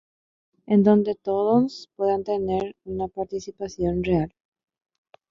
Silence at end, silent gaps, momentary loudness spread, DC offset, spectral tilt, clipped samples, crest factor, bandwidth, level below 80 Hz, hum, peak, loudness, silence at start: 1.05 s; none; 13 LU; under 0.1%; -8 dB/octave; under 0.1%; 20 dB; 7.4 kHz; -48 dBFS; none; -6 dBFS; -24 LUFS; 0.7 s